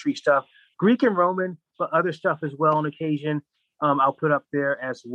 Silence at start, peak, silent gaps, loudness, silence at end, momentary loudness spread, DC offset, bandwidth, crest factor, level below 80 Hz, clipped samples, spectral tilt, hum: 0 s; -6 dBFS; none; -23 LUFS; 0 s; 9 LU; under 0.1%; 8.6 kHz; 16 dB; -76 dBFS; under 0.1%; -7.5 dB/octave; none